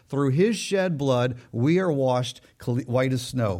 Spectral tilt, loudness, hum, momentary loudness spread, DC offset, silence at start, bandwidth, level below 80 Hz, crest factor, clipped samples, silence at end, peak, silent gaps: -6.5 dB/octave; -24 LUFS; none; 7 LU; under 0.1%; 0.1 s; 15.5 kHz; -58 dBFS; 14 dB; under 0.1%; 0 s; -10 dBFS; none